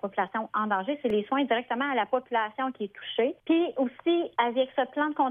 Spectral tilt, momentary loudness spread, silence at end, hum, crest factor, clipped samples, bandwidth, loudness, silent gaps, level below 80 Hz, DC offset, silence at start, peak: -7.5 dB/octave; 4 LU; 0 s; none; 18 dB; under 0.1%; 3.8 kHz; -28 LUFS; none; -72 dBFS; under 0.1%; 0.05 s; -10 dBFS